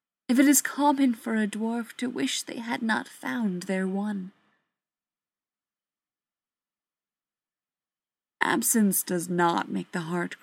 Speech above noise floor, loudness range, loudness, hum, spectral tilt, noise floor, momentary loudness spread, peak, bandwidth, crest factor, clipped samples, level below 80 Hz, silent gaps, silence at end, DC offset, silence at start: over 64 dB; 11 LU; -26 LUFS; none; -4 dB/octave; under -90 dBFS; 11 LU; -6 dBFS; 16.5 kHz; 24 dB; under 0.1%; -82 dBFS; none; 0.05 s; under 0.1%; 0.3 s